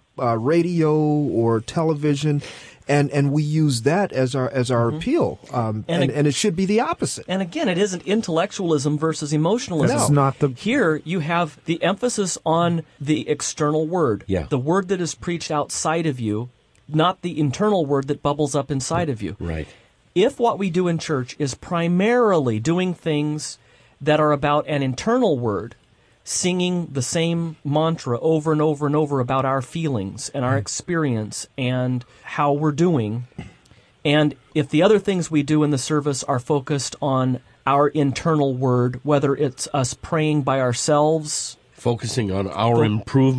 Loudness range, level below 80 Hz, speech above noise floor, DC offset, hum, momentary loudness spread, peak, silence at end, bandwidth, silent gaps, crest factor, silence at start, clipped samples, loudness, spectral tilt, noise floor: 2 LU; -52 dBFS; 33 dB; under 0.1%; none; 7 LU; -4 dBFS; 0 s; 11 kHz; none; 16 dB; 0.15 s; under 0.1%; -21 LUFS; -5.5 dB/octave; -53 dBFS